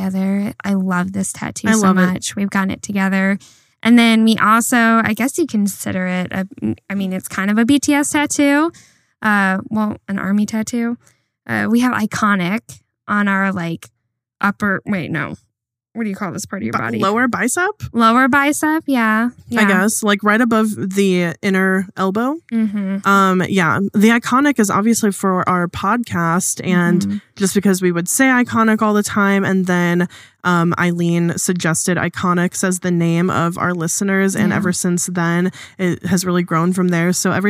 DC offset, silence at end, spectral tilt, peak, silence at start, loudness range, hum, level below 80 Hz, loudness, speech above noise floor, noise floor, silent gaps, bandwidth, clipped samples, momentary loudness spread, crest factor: under 0.1%; 0 s; -5 dB/octave; 0 dBFS; 0 s; 4 LU; none; -56 dBFS; -16 LUFS; 36 dB; -53 dBFS; none; 16 kHz; under 0.1%; 9 LU; 16 dB